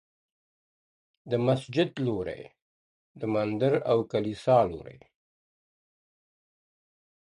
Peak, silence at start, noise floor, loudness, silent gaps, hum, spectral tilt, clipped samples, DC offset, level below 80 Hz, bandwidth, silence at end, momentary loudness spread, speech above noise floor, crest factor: -10 dBFS; 1.25 s; under -90 dBFS; -27 LUFS; 2.62-3.15 s; none; -7.5 dB/octave; under 0.1%; under 0.1%; -62 dBFS; 11.5 kHz; 2.45 s; 12 LU; over 63 dB; 20 dB